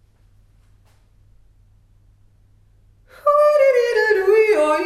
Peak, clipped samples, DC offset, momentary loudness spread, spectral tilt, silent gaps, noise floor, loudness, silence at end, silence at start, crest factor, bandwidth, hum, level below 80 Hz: -4 dBFS; under 0.1%; under 0.1%; 4 LU; -3.5 dB/octave; none; -53 dBFS; -16 LUFS; 0 s; 3.25 s; 16 dB; 14 kHz; none; -56 dBFS